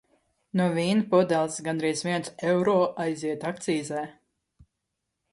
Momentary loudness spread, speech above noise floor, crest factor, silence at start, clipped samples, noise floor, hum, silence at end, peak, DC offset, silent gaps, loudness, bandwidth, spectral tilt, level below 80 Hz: 9 LU; 57 dB; 20 dB; 0.55 s; under 0.1%; -82 dBFS; none; 1.2 s; -8 dBFS; under 0.1%; none; -26 LUFS; 11.5 kHz; -5.5 dB/octave; -68 dBFS